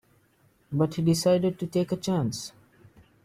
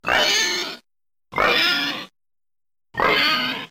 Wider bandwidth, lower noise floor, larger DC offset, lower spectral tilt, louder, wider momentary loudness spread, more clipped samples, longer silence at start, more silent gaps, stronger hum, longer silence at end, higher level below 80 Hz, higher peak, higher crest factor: about the same, 16 kHz vs 16.5 kHz; second, -64 dBFS vs under -90 dBFS; neither; first, -6.5 dB/octave vs -1 dB/octave; second, -26 LUFS vs -18 LUFS; second, 11 LU vs 15 LU; neither; first, 0.7 s vs 0.05 s; neither; neither; first, 0.75 s vs 0.05 s; second, -60 dBFS vs -52 dBFS; second, -12 dBFS vs -4 dBFS; about the same, 16 dB vs 18 dB